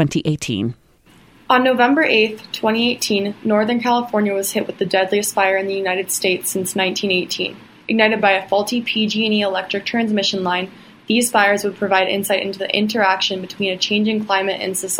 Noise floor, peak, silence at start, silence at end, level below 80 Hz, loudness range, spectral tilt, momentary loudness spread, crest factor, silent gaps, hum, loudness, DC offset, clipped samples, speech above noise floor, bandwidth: -50 dBFS; 0 dBFS; 0 s; 0 s; -60 dBFS; 2 LU; -3.5 dB/octave; 8 LU; 18 dB; none; none; -18 LUFS; under 0.1%; under 0.1%; 32 dB; 16.5 kHz